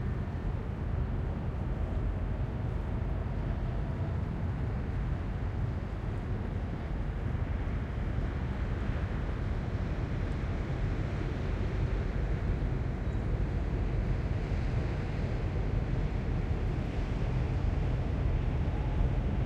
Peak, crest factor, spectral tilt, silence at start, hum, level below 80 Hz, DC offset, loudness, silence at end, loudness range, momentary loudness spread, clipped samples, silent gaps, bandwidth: -18 dBFS; 14 dB; -8.5 dB/octave; 0 s; none; -34 dBFS; under 0.1%; -34 LUFS; 0 s; 2 LU; 3 LU; under 0.1%; none; 7.4 kHz